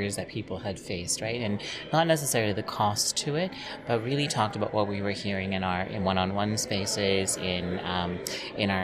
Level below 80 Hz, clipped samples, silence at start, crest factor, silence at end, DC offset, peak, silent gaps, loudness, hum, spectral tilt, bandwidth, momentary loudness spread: -56 dBFS; under 0.1%; 0 s; 18 dB; 0 s; under 0.1%; -10 dBFS; none; -28 LUFS; none; -4 dB/octave; 15.5 kHz; 8 LU